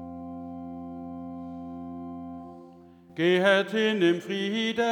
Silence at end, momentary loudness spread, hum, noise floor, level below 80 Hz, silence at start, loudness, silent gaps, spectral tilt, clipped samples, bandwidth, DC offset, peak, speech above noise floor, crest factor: 0 s; 18 LU; none; -51 dBFS; -66 dBFS; 0 s; -24 LUFS; none; -5.5 dB/octave; under 0.1%; 11 kHz; under 0.1%; -8 dBFS; 27 dB; 20 dB